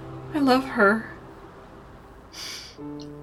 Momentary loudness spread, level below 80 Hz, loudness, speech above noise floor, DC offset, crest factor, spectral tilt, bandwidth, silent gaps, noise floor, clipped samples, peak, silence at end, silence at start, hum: 25 LU; -54 dBFS; -23 LUFS; 24 dB; under 0.1%; 20 dB; -5 dB/octave; 15.5 kHz; none; -46 dBFS; under 0.1%; -6 dBFS; 0 s; 0 s; none